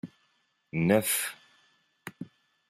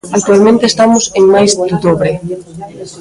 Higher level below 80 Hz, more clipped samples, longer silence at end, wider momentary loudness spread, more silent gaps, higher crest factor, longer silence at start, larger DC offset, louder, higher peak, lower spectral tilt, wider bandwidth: second, -68 dBFS vs -44 dBFS; neither; first, 0.45 s vs 0 s; first, 22 LU vs 18 LU; neither; first, 24 dB vs 10 dB; about the same, 0.05 s vs 0.05 s; neither; second, -28 LUFS vs -9 LUFS; second, -10 dBFS vs 0 dBFS; about the same, -4.5 dB/octave vs -4.5 dB/octave; first, 15.5 kHz vs 11.5 kHz